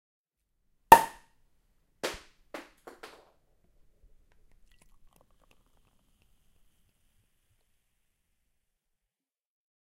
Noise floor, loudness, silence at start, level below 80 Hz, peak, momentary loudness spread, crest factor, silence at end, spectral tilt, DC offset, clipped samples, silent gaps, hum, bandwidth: under -90 dBFS; -23 LUFS; 0.9 s; -60 dBFS; -2 dBFS; 28 LU; 32 dB; 7.9 s; -3 dB/octave; under 0.1%; under 0.1%; none; none; 16 kHz